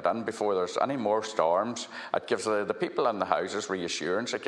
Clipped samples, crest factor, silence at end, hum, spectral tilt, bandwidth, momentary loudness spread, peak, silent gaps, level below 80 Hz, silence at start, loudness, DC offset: under 0.1%; 22 dB; 0 s; none; -4 dB/octave; 11.5 kHz; 5 LU; -8 dBFS; none; -74 dBFS; 0 s; -29 LUFS; under 0.1%